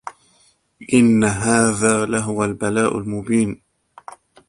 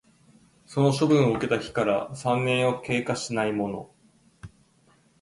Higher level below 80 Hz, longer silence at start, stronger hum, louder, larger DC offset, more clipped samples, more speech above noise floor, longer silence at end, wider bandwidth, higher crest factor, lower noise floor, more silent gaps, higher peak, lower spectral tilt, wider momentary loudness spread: first, -50 dBFS vs -60 dBFS; second, 0.05 s vs 0.7 s; neither; first, -18 LUFS vs -25 LUFS; neither; neither; first, 41 dB vs 37 dB; second, 0.35 s vs 0.75 s; about the same, 11.5 kHz vs 11.5 kHz; about the same, 20 dB vs 18 dB; second, -58 dBFS vs -62 dBFS; neither; first, 0 dBFS vs -8 dBFS; about the same, -5 dB/octave vs -6 dB/octave; about the same, 10 LU vs 9 LU